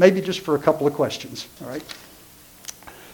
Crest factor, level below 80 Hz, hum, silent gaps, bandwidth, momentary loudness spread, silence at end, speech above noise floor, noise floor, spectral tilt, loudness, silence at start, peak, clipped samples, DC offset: 22 dB; -60 dBFS; none; none; 19 kHz; 19 LU; 0 s; 26 dB; -48 dBFS; -5 dB/octave; -23 LUFS; 0 s; 0 dBFS; under 0.1%; under 0.1%